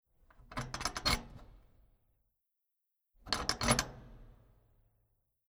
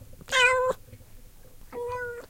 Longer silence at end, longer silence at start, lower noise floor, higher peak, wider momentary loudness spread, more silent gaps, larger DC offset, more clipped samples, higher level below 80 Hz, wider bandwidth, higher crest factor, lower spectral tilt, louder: first, 1.15 s vs 0.05 s; first, 0.4 s vs 0 s; first, -86 dBFS vs -48 dBFS; second, -14 dBFS vs -8 dBFS; about the same, 15 LU vs 17 LU; neither; neither; neither; about the same, -52 dBFS vs -50 dBFS; first, over 20 kHz vs 16.5 kHz; first, 28 dB vs 20 dB; first, -2.5 dB/octave vs -1 dB/octave; second, -35 LUFS vs -24 LUFS